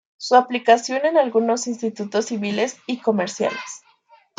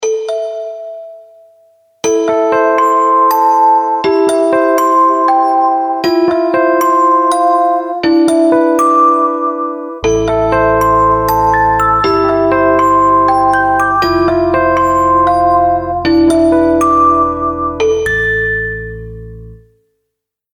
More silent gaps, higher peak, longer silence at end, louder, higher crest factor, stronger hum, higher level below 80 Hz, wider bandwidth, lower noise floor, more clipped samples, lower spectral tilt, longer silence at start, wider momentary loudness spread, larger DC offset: neither; about the same, -2 dBFS vs 0 dBFS; second, 0.6 s vs 1 s; second, -20 LUFS vs -11 LUFS; first, 18 dB vs 10 dB; neither; second, -74 dBFS vs -34 dBFS; second, 9.4 kHz vs 17 kHz; second, -55 dBFS vs -75 dBFS; neither; second, -4 dB/octave vs -5.5 dB/octave; first, 0.2 s vs 0 s; about the same, 9 LU vs 8 LU; neither